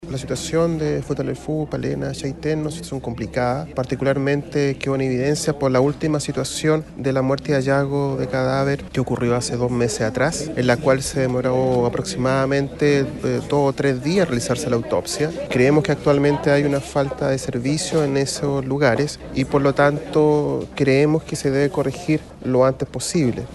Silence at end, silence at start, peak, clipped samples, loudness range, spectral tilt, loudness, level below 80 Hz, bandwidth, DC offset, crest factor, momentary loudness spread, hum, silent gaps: 0 s; 0 s; -2 dBFS; under 0.1%; 4 LU; -5.5 dB/octave; -20 LUFS; -42 dBFS; 12.5 kHz; under 0.1%; 16 dB; 7 LU; none; none